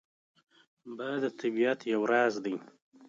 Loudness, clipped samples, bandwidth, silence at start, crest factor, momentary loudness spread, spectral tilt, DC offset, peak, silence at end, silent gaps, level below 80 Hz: -31 LUFS; under 0.1%; 7.6 kHz; 0.85 s; 18 dB; 13 LU; -5 dB/octave; under 0.1%; -14 dBFS; 0 s; 2.82-2.92 s; -84 dBFS